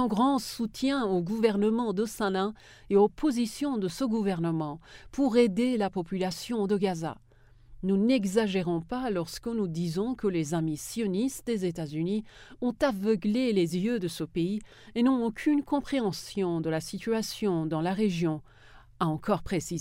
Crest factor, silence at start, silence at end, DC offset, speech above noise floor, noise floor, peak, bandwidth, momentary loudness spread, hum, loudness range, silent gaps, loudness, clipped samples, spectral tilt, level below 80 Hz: 18 dB; 0 s; 0 s; under 0.1%; 26 dB; -54 dBFS; -10 dBFS; 16 kHz; 7 LU; none; 3 LU; none; -29 LUFS; under 0.1%; -6 dB/octave; -56 dBFS